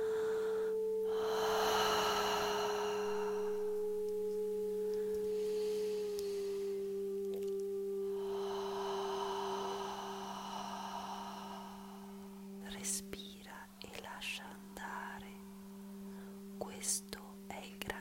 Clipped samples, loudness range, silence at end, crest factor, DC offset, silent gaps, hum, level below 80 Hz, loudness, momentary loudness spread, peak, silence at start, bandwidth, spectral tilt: under 0.1%; 10 LU; 0 s; 20 dB; under 0.1%; none; none; -68 dBFS; -39 LUFS; 15 LU; -18 dBFS; 0 s; 16 kHz; -3 dB/octave